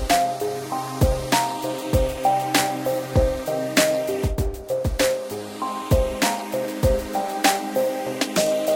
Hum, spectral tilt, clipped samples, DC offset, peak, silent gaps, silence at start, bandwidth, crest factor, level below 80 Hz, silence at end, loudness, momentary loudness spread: none; -4.5 dB/octave; under 0.1%; under 0.1%; -4 dBFS; none; 0 s; 17 kHz; 20 dB; -32 dBFS; 0 s; -23 LUFS; 8 LU